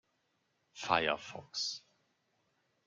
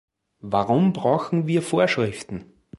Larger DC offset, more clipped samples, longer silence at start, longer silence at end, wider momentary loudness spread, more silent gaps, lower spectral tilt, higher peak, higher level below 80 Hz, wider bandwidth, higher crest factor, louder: neither; neither; first, 0.75 s vs 0.45 s; first, 1.1 s vs 0.35 s; second, 13 LU vs 16 LU; neither; second, -2 dB/octave vs -6.5 dB/octave; second, -12 dBFS vs -4 dBFS; second, -74 dBFS vs -56 dBFS; about the same, 11.5 kHz vs 11.5 kHz; first, 28 dB vs 18 dB; second, -35 LUFS vs -22 LUFS